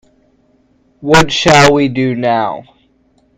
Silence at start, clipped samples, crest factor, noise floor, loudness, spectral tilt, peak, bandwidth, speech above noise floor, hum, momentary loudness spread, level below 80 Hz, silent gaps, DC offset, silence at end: 1 s; 0.3%; 14 dB; -54 dBFS; -10 LUFS; -4.5 dB/octave; 0 dBFS; over 20 kHz; 44 dB; none; 15 LU; -38 dBFS; none; under 0.1%; 0.75 s